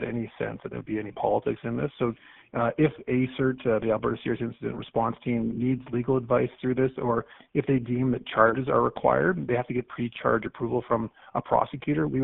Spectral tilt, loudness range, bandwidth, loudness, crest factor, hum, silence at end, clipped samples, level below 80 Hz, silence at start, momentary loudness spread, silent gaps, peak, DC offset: -6.5 dB/octave; 3 LU; 4 kHz; -27 LUFS; 22 dB; none; 0 s; under 0.1%; -54 dBFS; 0 s; 9 LU; none; -6 dBFS; under 0.1%